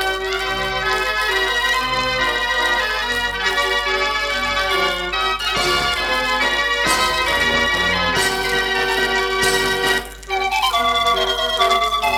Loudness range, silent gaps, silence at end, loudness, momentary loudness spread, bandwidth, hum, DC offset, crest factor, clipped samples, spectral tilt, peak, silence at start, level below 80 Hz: 1 LU; none; 0 s; -17 LUFS; 4 LU; 18.5 kHz; 50 Hz at -35 dBFS; under 0.1%; 16 dB; under 0.1%; -2 dB/octave; -2 dBFS; 0 s; -38 dBFS